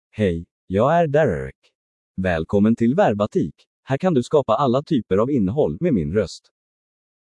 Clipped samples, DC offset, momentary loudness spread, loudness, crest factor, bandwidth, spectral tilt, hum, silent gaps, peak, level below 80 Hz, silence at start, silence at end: under 0.1%; under 0.1%; 11 LU; -20 LUFS; 16 dB; 10 kHz; -8 dB/octave; none; 0.51-0.67 s, 1.55-1.62 s, 1.75-2.14 s, 3.67-3.83 s; -4 dBFS; -48 dBFS; 0.15 s; 0.85 s